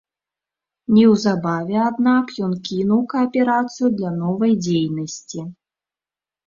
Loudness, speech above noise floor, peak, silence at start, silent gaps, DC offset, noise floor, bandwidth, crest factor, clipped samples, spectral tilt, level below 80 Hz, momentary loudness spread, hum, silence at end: -19 LUFS; over 72 dB; -2 dBFS; 0.9 s; none; under 0.1%; under -90 dBFS; 7.4 kHz; 16 dB; under 0.1%; -6.5 dB/octave; -60 dBFS; 14 LU; none; 0.95 s